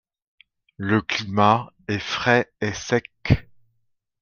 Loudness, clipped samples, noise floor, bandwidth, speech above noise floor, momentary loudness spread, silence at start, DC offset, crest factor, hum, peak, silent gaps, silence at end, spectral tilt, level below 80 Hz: -22 LUFS; under 0.1%; -72 dBFS; 7.2 kHz; 51 dB; 9 LU; 0.8 s; under 0.1%; 22 dB; none; -2 dBFS; none; 0.8 s; -5.5 dB/octave; -46 dBFS